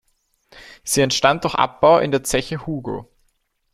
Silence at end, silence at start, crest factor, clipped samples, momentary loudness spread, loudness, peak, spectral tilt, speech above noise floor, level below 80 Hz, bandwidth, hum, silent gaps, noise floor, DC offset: 0.7 s; 0.55 s; 20 dB; under 0.1%; 15 LU; -18 LUFS; -2 dBFS; -3.5 dB/octave; 48 dB; -46 dBFS; 15.5 kHz; none; none; -67 dBFS; under 0.1%